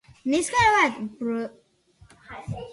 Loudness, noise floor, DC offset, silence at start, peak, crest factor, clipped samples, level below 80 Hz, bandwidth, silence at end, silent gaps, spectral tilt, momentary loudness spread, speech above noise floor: -23 LUFS; -56 dBFS; under 0.1%; 0.25 s; -8 dBFS; 18 dB; under 0.1%; -54 dBFS; 11.5 kHz; 0 s; none; -4 dB/octave; 19 LU; 33 dB